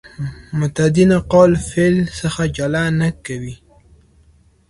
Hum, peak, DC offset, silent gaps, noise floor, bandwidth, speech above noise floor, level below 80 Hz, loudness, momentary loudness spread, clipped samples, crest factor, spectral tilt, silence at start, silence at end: none; 0 dBFS; under 0.1%; none; -52 dBFS; 11.5 kHz; 36 dB; -40 dBFS; -16 LUFS; 16 LU; under 0.1%; 16 dB; -6.5 dB/octave; 0.2 s; 1.15 s